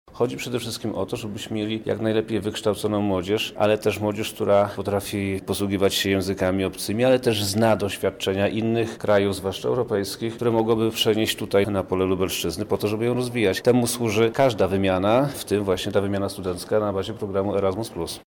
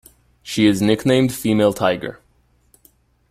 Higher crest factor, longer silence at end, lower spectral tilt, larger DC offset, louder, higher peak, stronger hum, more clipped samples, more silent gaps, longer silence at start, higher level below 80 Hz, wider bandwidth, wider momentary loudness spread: about the same, 14 dB vs 18 dB; second, 0.05 s vs 1.15 s; about the same, -5 dB/octave vs -5.5 dB/octave; neither; second, -23 LUFS vs -18 LUFS; second, -8 dBFS vs -2 dBFS; neither; neither; neither; second, 0.1 s vs 0.45 s; about the same, -54 dBFS vs -52 dBFS; first, over 20 kHz vs 16 kHz; second, 7 LU vs 10 LU